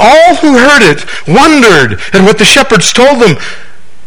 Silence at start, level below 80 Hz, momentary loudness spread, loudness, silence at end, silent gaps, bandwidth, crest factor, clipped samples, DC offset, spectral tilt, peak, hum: 0 s; -34 dBFS; 6 LU; -4 LUFS; 0.45 s; none; over 20 kHz; 6 dB; 10%; 10%; -3.5 dB/octave; 0 dBFS; none